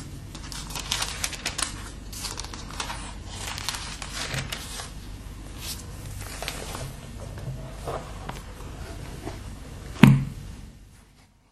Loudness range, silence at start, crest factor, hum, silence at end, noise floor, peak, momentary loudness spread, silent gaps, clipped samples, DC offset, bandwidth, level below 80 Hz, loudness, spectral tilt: 10 LU; 0 s; 30 dB; none; 0.25 s; -56 dBFS; 0 dBFS; 14 LU; none; under 0.1%; under 0.1%; 13.5 kHz; -42 dBFS; -29 LUFS; -4.5 dB/octave